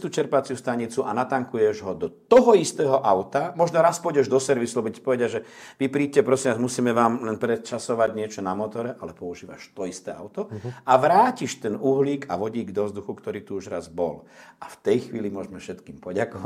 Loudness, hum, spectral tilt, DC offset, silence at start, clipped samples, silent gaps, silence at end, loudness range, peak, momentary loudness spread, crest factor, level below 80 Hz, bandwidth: -24 LUFS; none; -5.5 dB/octave; under 0.1%; 0 s; under 0.1%; none; 0 s; 9 LU; -2 dBFS; 16 LU; 20 dB; -66 dBFS; 14.5 kHz